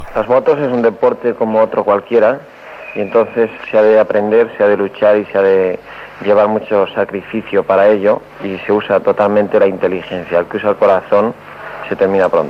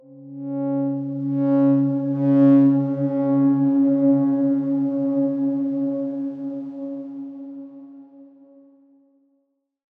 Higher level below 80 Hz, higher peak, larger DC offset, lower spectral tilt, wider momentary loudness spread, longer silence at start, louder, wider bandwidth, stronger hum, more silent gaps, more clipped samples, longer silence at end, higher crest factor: first, -50 dBFS vs -80 dBFS; first, -2 dBFS vs -6 dBFS; neither; second, -7.5 dB/octave vs -12 dB/octave; second, 12 LU vs 18 LU; about the same, 0 s vs 0.1 s; first, -13 LUFS vs -20 LUFS; first, 6 kHz vs 2.6 kHz; neither; neither; neither; second, 0 s vs 1.75 s; about the same, 12 dB vs 14 dB